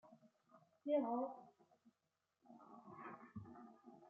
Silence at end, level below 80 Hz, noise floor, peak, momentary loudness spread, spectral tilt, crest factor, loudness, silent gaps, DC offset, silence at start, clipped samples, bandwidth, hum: 0 s; -86 dBFS; -89 dBFS; -30 dBFS; 22 LU; -6.5 dB/octave; 20 dB; -45 LUFS; none; under 0.1%; 0.05 s; under 0.1%; 4.4 kHz; none